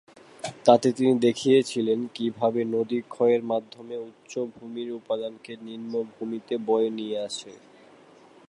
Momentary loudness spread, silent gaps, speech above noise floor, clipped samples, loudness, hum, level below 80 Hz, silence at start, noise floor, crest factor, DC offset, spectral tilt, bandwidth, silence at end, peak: 17 LU; none; 28 dB; under 0.1%; -26 LUFS; none; -74 dBFS; 0.45 s; -53 dBFS; 22 dB; under 0.1%; -5.5 dB/octave; 11.5 kHz; 0.95 s; -4 dBFS